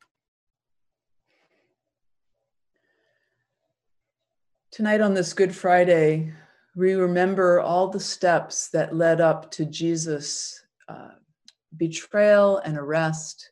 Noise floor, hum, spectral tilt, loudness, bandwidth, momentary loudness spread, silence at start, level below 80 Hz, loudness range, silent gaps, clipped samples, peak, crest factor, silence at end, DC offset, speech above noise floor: -79 dBFS; none; -5 dB/octave; -22 LUFS; 11.5 kHz; 12 LU; 4.75 s; -74 dBFS; 6 LU; none; under 0.1%; -6 dBFS; 18 dB; 0.1 s; under 0.1%; 58 dB